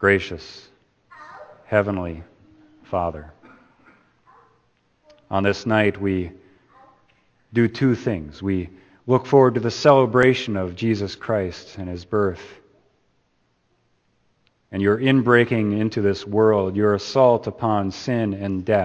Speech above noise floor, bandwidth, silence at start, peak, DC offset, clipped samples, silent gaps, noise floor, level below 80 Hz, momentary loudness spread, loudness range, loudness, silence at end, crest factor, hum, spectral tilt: 47 dB; 8.6 kHz; 0 s; 0 dBFS; under 0.1%; under 0.1%; none; -67 dBFS; -52 dBFS; 17 LU; 10 LU; -20 LUFS; 0 s; 22 dB; none; -7 dB/octave